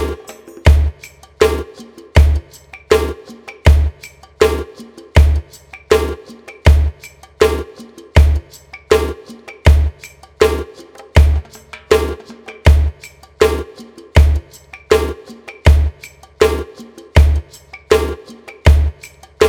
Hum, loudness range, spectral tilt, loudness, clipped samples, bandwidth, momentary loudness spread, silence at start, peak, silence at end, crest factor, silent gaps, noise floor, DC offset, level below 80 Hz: none; 0 LU; -6 dB/octave; -15 LUFS; under 0.1%; 15 kHz; 22 LU; 0 s; 0 dBFS; 0 s; 14 dB; none; -39 dBFS; under 0.1%; -18 dBFS